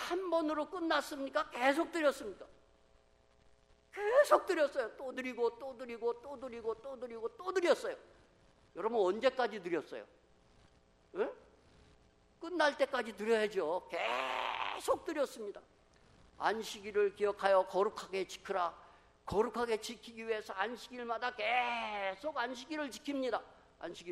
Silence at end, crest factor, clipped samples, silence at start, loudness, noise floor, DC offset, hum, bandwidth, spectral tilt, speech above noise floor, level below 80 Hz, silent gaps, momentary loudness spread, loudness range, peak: 0 s; 24 dB; under 0.1%; 0 s; -36 LUFS; -68 dBFS; under 0.1%; none; 14.5 kHz; -3.5 dB/octave; 32 dB; -70 dBFS; none; 14 LU; 4 LU; -12 dBFS